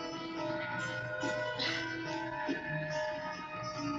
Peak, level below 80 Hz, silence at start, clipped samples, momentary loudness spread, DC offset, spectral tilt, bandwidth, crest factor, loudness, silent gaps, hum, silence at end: -22 dBFS; -66 dBFS; 0 s; under 0.1%; 6 LU; under 0.1%; -4.5 dB/octave; 8.2 kHz; 16 dB; -37 LUFS; none; none; 0 s